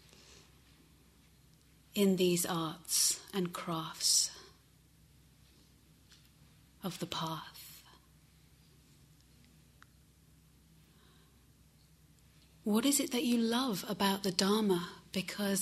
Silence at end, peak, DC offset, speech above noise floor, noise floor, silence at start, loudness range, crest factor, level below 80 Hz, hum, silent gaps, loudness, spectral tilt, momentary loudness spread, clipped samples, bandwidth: 0 s; -12 dBFS; under 0.1%; 32 dB; -64 dBFS; 0.3 s; 13 LU; 24 dB; -68 dBFS; none; none; -33 LUFS; -3.5 dB/octave; 15 LU; under 0.1%; 16 kHz